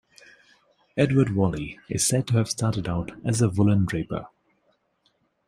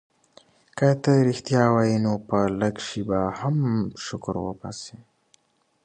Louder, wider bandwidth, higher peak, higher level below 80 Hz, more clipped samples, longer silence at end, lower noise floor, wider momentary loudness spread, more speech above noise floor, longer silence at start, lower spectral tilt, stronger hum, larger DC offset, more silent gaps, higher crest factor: about the same, -24 LUFS vs -24 LUFS; first, 15.5 kHz vs 9.4 kHz; about the same, -6 dBFS vs -4 dBFS; about the same, -50 dBFS vs -54 dBFS; neither; first, 1.2 s vs 0.9 s; first, -69 dBFS vs -64 dBFS; second, 11 LU vs 15 LU; first, 46 dB vs 41 dB; first, 0.95 s vs 0.75 s; second, -5.5 dB/octave vs -7 dB/octave; neither; neither; neither; about the same, 18 dB vs 20 dB